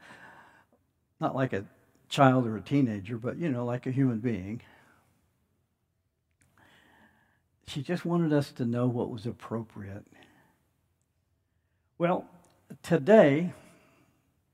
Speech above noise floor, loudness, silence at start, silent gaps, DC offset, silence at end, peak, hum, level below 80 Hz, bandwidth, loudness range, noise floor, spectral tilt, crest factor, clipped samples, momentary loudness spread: 50 dB; -28 LUFS; 0.1 s; none; under 0.1%; 1 s; -6 dBFS; none; -72 dBFS; 14.5 kHz; 11 LU; -77 dBFS; -7.5 dB/octave; 26 dB; under 0.1%; 18 LU